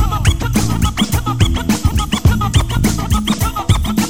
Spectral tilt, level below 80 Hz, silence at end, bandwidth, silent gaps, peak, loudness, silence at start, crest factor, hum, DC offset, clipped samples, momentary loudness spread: -5 dB/octave; -20 dBFS; 0 s; 17 kHz; none; -2 dBFS; -16 LUFS; 0 s; 12 dB; none; under 0.1%; under 0.1%; 2 LU